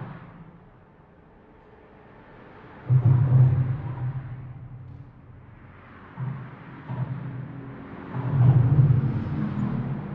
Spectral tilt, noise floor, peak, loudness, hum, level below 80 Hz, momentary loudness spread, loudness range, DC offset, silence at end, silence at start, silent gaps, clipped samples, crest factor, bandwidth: -12 dB/octave; -53 dBFS; -8 dBFS; -24 LUFS; none; -48 dBFS; 24 LU; 13 LU; under 0.1%; 0 s; 0 s; none; under 0.1%; 18 dB; 3.4 kHz